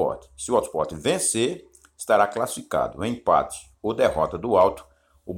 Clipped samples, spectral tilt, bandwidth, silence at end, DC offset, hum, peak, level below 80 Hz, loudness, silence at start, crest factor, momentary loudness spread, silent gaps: under 0.1%; -4 dB/octave; 17 kHz; 0 s; under 0.1%; none; -6 dBFS; -50 dBFS; -23 LUFS; 0 s; 18 dB; 13 LU; none